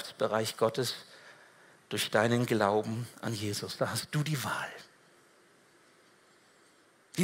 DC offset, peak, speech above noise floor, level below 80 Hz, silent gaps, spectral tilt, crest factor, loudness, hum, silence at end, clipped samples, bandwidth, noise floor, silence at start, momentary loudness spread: under 0.1%; -12 dBFS; 32 dB; -76 dBFS; none; -4.5 dB/octave; 22 dB; -32 LUFS; none; 0 s; under 0.1%; 16 kHz; -64 dBFS; 0 s; 14 LU